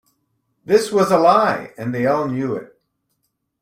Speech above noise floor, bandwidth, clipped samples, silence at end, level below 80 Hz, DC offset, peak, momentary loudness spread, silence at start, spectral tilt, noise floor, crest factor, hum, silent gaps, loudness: 55 dB; 16 kHz; under 0.1%; 1 s; -60 dBFS; under 0.1%; -2 dBFS; 12 LU; 0.7 s; -5.5 dB/octave; -72 dBFS; 18 dB; none; none; -17 LUFS